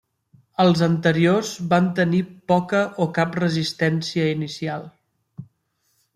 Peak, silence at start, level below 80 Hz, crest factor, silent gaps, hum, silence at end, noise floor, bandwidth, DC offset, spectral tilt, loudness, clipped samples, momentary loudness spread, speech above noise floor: -4 dBFS; 0.6 s; -62 dBFS; 18 dB; none; none; 0.7 s; -70 dBFS; 12 kHz; under 0.1%; -6 dB/octave; -21 LUFS; under 0.1%; 9 LU; 49 dB